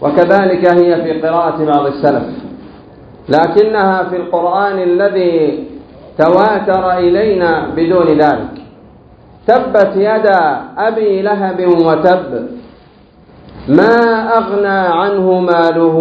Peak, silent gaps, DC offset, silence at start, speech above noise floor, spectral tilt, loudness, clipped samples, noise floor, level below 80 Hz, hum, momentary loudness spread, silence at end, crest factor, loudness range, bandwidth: 0 dBFS; none; under 0.1%; 0 s; 32 dB; -8.5 dB/octave; -11 LUFS; 0.3%; -42 dBFS; -46 dBFS; none; 9 LU; 0 s; 12 dB; 2 LU; 6.4 kHz